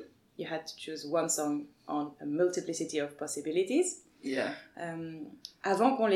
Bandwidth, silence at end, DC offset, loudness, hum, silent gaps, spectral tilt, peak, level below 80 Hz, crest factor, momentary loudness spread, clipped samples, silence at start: 15.5 kHz; 0 s; under 0.1%; -33 LUFS; none; none; -3.5 dB/octave; -14 dBFS; -82 dBFS; 20 dB; 13 LU; under 0.1%; 0 s